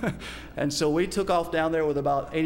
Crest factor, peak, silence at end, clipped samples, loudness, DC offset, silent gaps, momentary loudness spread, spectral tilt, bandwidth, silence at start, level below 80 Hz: 14 dB; -12 dBFS; 0 s; under 0.1%; -26 LUFS; under 0.1%; none; 7 LU; -5 dB/octave; 16.5 kHz; 0 s; -46 dBFS